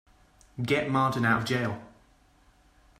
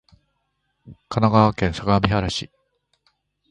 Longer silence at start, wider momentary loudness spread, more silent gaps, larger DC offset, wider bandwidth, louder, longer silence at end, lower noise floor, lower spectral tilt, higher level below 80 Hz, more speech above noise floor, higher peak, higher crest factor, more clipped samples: second, 0.55 s vs 0.85 s; about the same, 14 LU vs 12 LU; neither; neither; first, 15 kHz vs 10.5 kHz; second, -27 LUFS vs -20 LUFS; about the same, 1.1 s vs 1.1 s; second, -61 dBFS vs -73 dBFS; about the same, -6 dB/octave vs -6.5 dB/octave; second, -60 dBFS vs -40 dBFS; second, 35 dB vs 53 dB; second, -12 dBFS vs -2 dBFS; about the same, 20 dB vs 22 dB; neither